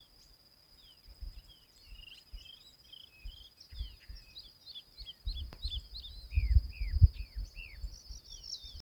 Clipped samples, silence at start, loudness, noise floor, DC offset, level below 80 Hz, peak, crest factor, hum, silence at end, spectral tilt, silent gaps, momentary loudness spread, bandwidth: under 0.1%; 1.05 s; -37 LUFS; -62 dBFS; under 0.1%; -38 dBFS; -8 dBFS; 28 dB; none; 0 s; -5 dB/octave; none; 25 LU; 19.5 kHz